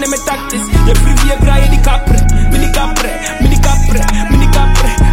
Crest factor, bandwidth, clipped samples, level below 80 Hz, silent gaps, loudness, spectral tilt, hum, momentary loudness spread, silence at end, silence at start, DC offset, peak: 8 dB; 16 kHz; under 0.1%; -10 dBFS; none; -12 LUFS; -5 dB/octave; none; 5 LU; 0 s; 0 s; under 0.1%; 0 dBFS